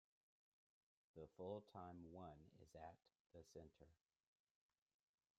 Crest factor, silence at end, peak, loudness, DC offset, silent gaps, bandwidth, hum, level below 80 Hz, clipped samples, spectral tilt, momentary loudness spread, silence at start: 24 dB; 1.45 s; -38 dBFS; -60 LUFS; under 0.1%; 3.20-3.30 s; 7.2 kHz; none; -84 dBFS; under 0.1%; -7 dB/octave; 13 LU; 1.15 s